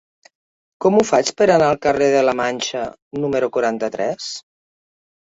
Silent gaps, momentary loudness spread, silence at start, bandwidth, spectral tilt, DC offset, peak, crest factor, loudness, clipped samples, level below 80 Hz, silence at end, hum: 3.02-3.11 s; 13 LU; 0.8 s; 8 kHz; -4.5 dB/octave; under 0.1%; -2 dBFS; 18 dB; -18 LUFS; under 0.1%; -56 dBFS; 1 s; none